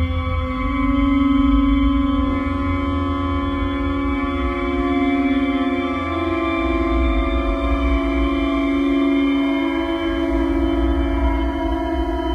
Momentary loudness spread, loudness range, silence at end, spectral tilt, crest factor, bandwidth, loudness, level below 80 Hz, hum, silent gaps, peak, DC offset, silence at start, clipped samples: 5 LU; 2 LU; 0 s; -8 dB/octave; 12 dB; 6.4 kHz; -20 LUFS; -24 dBFS; none; none; -6 dBFS; under 0.1%; 0 s; under 0.1%